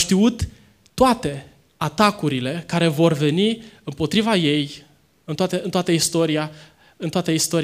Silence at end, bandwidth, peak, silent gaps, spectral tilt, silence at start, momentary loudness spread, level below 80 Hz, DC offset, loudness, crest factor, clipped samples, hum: 0 s; 15.5 kHz; -2 dBFS; none; -4.5 dB/octave; 0 s; 13 LU; -46 dBFS; under 0.1%; -20 LUFS; 20 dB; under 0.1%; none